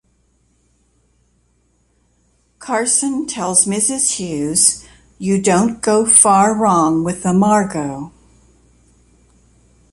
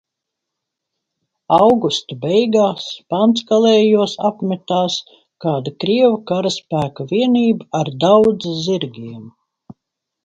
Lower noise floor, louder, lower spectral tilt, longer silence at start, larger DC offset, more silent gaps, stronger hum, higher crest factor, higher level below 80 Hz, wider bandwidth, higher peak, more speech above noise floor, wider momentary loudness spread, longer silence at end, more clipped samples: second, -60 dBFS vs -80 dBFS; about the same, -14 LUFS vs -16 LUFS; second, -3.5 dB/octave vs -6 dB/octave; first, 2.6 s vs 1.5 s; neither; neither; neither; about the same, 18 dB vs 16 dB; first, -52 dBFS vs -58 dBFS; first, 16 kHz vs 8.8 kHz; about the same, 0 dBFS vs 0 dBFS; second, 45 dB vs 65 dB; first, 15 LU vs 11 LU; first, 1.85 s vs 0.95 s; neither